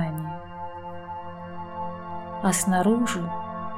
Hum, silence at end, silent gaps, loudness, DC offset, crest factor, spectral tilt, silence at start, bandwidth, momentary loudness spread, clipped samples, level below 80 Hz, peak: none; 0 s; none; -28 LUFS; 0.4%; 18 dB; -5 dB/octave; 0 s; 16 kHz; 16 LU; under 0.1%; -58 dBFS; -10 dBFS